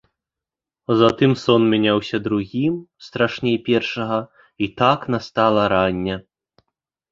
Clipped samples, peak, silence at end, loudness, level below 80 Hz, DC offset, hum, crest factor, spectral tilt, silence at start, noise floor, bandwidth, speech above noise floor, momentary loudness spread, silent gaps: under 0.1%; -2 dBFS; 0.9 s; -19 LUFS; -52 dBFS; under 0.1%; none; 18 dB; -7 dB/octave; 0.9 s; -88 dBFS; 7.6 kHz; 69 dB; 11 LU; none